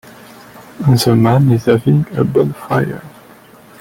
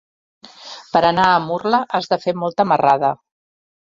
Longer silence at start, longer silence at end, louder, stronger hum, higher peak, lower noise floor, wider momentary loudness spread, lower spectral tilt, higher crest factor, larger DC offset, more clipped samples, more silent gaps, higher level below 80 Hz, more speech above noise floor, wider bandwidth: about the same, 0.55 s vs 0.6 s; about the same, 0.7 s vs 0.65 s; first, -14 LUFS vs -17 LUFS; neither; about the same, -2 dBFS vs -2 dBFS; about the same, -41 dBFS vs -38 dBFS; second, 7 LU vs 11 LU; about the same, -7 dB/octave vs -6 dB/octave; about the same, 14 dB vs 18 dB; neither; neither; neither; first, -46 dBFS vs -56 dBFS; first, 29 dB vs 22 dB; first, 17 kHz vs 7.6 kHz